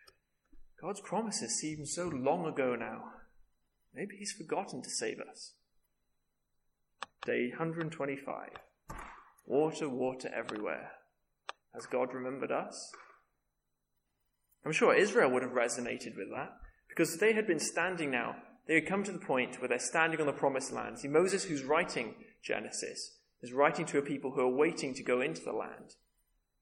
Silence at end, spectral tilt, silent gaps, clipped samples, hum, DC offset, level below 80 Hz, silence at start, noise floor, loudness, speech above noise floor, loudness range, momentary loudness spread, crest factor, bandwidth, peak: 0.7 s; -4 dB/octave; none; under 0.1%; none; under 0.1%; -68 dBFS; 0.55 s; -83 dBFS; -34 LUFS; 49 dB; 9 LU; 18 LU; 24 dB; 16 kHz; -12 dBFS